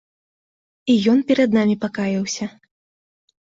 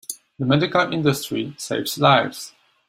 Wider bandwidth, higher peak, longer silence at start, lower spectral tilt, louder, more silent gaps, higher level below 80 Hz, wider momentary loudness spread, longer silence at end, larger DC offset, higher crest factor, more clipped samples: second, 7.8 kHz vs 16 kHz; second, -6 dBFS vs -2 dBFS; first, 0.85 s vs 0.1 s; about the same, -5.5 dB/octave vs -5 dB/octave; about the same, -19 LUFS vs -20 LUFS; neither; about the same, -60 dBFS vs -58 dBFS; second, 12 LU vs 15 LU; first, 0.95 s vs 0.4 s; neither; about the same, 16 dB vs 20 dB; neither